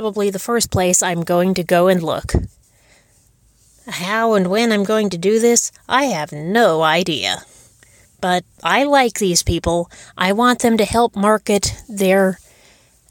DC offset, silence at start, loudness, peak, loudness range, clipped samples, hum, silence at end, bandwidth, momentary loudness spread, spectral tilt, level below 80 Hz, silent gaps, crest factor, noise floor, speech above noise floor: under 0.1%; 0 s; -16 LUFS; -2 dBFS; 4 LU; under 0.1%; none; 0.75 s; 17.5 kHz; 8 LU; -4 dB/octave; -38 dBFS; none; 16 dB; -55 dBFS; 38 dB